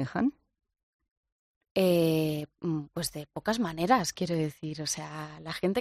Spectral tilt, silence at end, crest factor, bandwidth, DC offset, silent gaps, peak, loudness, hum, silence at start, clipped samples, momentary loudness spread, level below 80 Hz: -5 dB/octave; 0 s; 20 dB; 14 kHz; under 0.1%; 0.83-0.99 s, 1.11-1.23 s, 1.32-1.61 s, 1.71-1.75 s; -10 dBFS; -30 LUFS; none; 0 s; under 0.1%; 10 LU; -62 dBFS